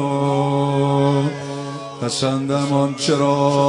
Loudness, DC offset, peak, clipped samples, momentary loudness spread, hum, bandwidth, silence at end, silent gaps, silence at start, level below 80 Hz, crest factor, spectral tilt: -19 LUFS; under 0.1%; -4 dBFS; under 0.1%; 11 LU; none; 11 kHz; 0 s; none; 0 s; -60 dBFS; 14 dB; -6 dB/octave